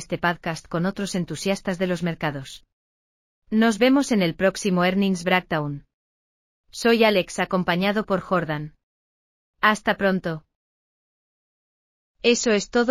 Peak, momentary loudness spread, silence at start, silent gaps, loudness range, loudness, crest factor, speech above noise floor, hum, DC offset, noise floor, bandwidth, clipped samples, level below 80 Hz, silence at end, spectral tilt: -4 dBFS; 11 LU; 0 s; 2.73-3.42 s, 5.94-6.64 s, 8.83-9.54 s, 10.55-12.14 s; 5 LU; -22 LUFS; 20 dB; over 68 dB; none; under 0.1%; under -90 dBFS; 15 kHz; under 0.1%; -54 dBFS; 0 s; -5 dB/octave